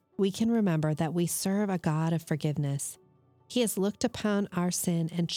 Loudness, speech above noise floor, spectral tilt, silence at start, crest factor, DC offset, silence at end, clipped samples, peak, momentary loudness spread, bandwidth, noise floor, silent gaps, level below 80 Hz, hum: -29 LUFS; 31 dB; -5.5 dB/octave; 0.2 s; 14 dB; under 0.1%; 0 s; under 0.1%; -14 dBFS; 4 LU; 18.5 kHz; -60 dBFS; none; -66 dBFS; none